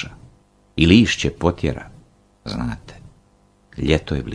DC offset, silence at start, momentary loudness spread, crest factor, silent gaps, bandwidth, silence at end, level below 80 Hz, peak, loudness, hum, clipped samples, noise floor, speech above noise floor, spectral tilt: under 0.1%; 0 s; 21 LU; 22 dB; none; 10.5 kHz; 0 s; -36 dBFS; 0 dBFS; -19 LUFS; none; under 0.1%; -56 dBFS; 38 dB; -5.5 dB/octave